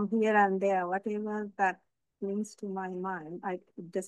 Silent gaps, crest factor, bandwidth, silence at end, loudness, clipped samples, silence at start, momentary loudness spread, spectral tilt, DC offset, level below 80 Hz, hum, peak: none; 20 dB; 11.5 kHz; 0 s; -32 LUFS; under 0.1%; 0 s; 13 LU; -6.5 dB/octave; under 0.1%; -82 dBFS; none; -12 dBFS